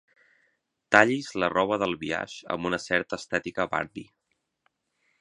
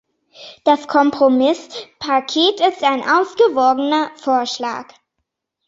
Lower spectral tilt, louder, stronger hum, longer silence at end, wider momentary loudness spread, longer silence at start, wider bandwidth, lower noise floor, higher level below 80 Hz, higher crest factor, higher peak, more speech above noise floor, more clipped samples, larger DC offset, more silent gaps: first, -4.5 dB/octave vs -3 dB/octave; second, -26 LUFS vs -16 LUFS; neither; first, 1.15 s vs 0.85 s; about the same, 12 LU vs 10 LU; first, 0.9 s vs 0.4 s; first, 11 kHz vs 7.8 kHz; about the same, -78 dBFS vs -76 dBFS; about the same, -62 dBFS vs -64 dBFS; first, 28 dB vs 16 dB; about the same, 0 dBFS vs -2 dBFS; second, 52 dB vs 60 dB; neither; neither; neither